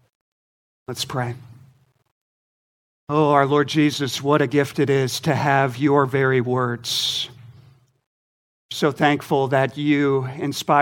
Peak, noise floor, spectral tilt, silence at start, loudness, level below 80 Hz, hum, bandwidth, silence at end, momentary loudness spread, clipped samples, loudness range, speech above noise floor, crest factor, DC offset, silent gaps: -2 dBFS; -55 dBFS; -5 dB/octave; 0.9 s; -20 LUFS; -64 dBFS; none; 17 kHz; 0 s; 9 LU; under 0.1%; 4 LU; 36 dB; 20 dB; under 0.1%; 2.12-3.07 s, 8.06-8.69 s